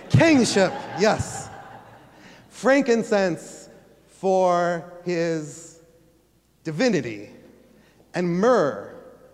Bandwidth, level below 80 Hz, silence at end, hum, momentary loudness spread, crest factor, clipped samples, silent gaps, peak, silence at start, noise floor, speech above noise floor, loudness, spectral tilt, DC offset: 13.5 kHz; -54 dBFS; 0.25 s; none; 21 LU; 20 dB; under 0.1%; none; -4 dBFS; 0 s; -61 dBFS; 39 dB; -22 LUFS; -5.5 dB/octave; under 0.1%